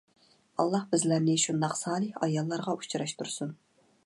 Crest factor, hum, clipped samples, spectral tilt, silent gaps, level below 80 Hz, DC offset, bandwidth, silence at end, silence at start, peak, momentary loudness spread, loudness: 18 dB; none; under 0.1%; -4.5 dB/octave; none; -74 dBFS; under 0.1%; 11.5 kHz; 0.5 s; 0.6 s; -12 dBFS; 9 LU; -30 LUFS